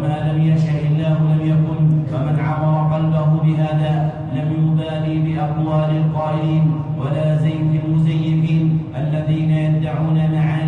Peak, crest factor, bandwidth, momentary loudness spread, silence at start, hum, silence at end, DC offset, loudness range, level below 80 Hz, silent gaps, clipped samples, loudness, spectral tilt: -6 dBFS; 10 dB; 4.2 kHz; 4 LU; 0 s; none; 0 s; under 0.1%; 2 LU; -44 dBFS; none; under 0.1%; -18 LUFS; -10 dB/octave